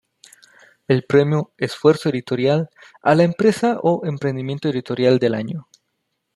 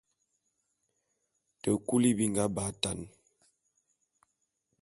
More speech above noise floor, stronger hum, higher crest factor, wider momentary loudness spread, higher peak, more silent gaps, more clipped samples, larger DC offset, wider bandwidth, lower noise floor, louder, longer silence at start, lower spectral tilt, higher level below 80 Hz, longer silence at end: first, 56 dB vs 50 dB; neither; second, 18 dB vs 24 dB; second, 8 LU vs 12 LU; first, -2 dBFS vs -10 dBFS; neither; neither; neither; about the same, 12.5 kHz vs 12 kHz; second, -74 dBFS vs -80 dBFS; first, -19 LUFS vs -30 LUFS; second, 0.9 s vs 1.65 s; first, -7 dB/octave vs -4.5 dB/octave; about the same, -62 dBFS vs -62 dBFS; second, 0.75 s vs 1.75 s